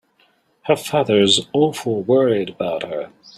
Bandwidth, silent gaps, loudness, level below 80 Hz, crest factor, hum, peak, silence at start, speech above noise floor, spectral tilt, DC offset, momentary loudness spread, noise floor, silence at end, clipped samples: 14.5 kHz; none; -18 LUFS; -60 dBFS; 18 dB; none; -2 dBFS; 0.65 s; 42 dB; -4.5 dB/octave; under 0.1%; 12 LU; -60 dBFS; 0.3 s; under 0.1%